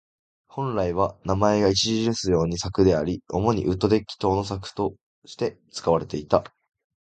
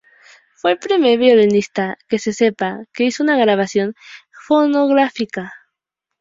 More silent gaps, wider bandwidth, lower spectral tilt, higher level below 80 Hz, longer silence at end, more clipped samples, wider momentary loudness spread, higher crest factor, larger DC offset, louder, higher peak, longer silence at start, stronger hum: first, 5.01-5.22 s vs none; first, 9.2 kHz vs 7.8 kHz; about the same, -5.5 dB/octave vs -5 dB/octave; first, -44 dBFS vs -62 dBFS; about the same, 0.6 s vs 0.65 s; neither; about the same, 10 LU vs 12 LU; first, 24 dB vs 14 dB; neither; second, -24 LUFS vs -16 LUFS; about the same, -2 dBFS vs -2 dBFS; about the same, 0.55 s vs 0.65 s; neither